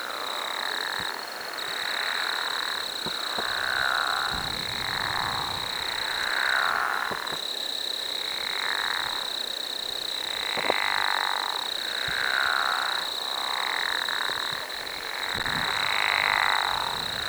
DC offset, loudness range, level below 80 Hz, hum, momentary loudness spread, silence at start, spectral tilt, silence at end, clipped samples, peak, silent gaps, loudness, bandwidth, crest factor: under 0.1%; 2 LU; -58 dBFS; none; 6 LU; 0 s; -0.5 dB/octave; 0 s; under 0.1%; -6 dBFS; none; -26 LUFS; over 20 kHz; 24 dB